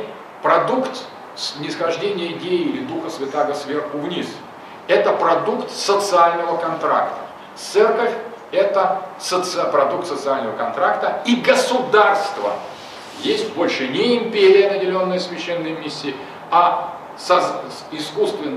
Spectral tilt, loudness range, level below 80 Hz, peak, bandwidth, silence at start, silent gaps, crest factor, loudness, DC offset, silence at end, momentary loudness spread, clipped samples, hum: -4 dB/octave; 4 LU; -68 dBFS; -2 dBFS; 13.5 kHz; 0 s; none; 18 dB; -19 LUFS; under 0.1%; 0 s; 14 LU; under 0.1%; none